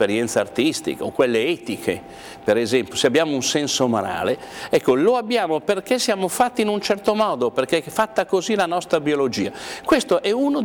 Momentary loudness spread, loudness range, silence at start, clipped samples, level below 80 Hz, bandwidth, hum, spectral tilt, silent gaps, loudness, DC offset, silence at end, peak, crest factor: 7 LU; 1 LU; 0 s; under 0.1%; -56 dBFS; over 20 kHz; none; -4 dB/octave; none; -21 LUFS; under 0.1%; 0 s; -6 dBFS; 16 dB